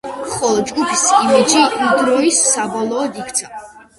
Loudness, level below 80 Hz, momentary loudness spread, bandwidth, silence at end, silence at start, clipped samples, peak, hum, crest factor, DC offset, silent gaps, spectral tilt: -14 LUFS; -54 dBFS; 10 LU; 11.5 kHz; 0.25 s; 0.05 s; under 0.1%; 0 dBFS; none; 16 dB; under 0.1%; none; -2 dB/octave